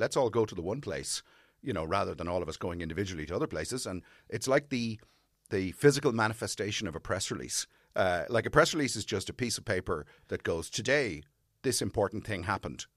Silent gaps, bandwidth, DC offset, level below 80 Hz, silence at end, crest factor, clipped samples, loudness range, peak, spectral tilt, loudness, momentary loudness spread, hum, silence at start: none; 15 kHz; under 0.1%; -56 dBFS; 0.1 s; 24 dB; under 0.1%; 5 LU; -8 dBFS; -4 dB/octave; -32 LUFS; 11 LU; none; 0 s